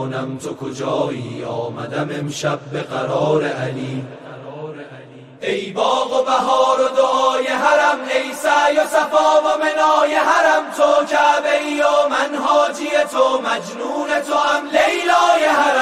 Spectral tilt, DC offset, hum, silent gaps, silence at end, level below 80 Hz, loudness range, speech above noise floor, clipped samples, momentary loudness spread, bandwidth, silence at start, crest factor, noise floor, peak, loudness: -4 dB/octave; 0.1%; none; none; 0 s; -64 dBFS; 8 LU; 22 dB; under 0.1%; 12 LU; 15 kHz; 0 s; 16 dB; -39 dBFS; -2 dBFS; -17 LUFS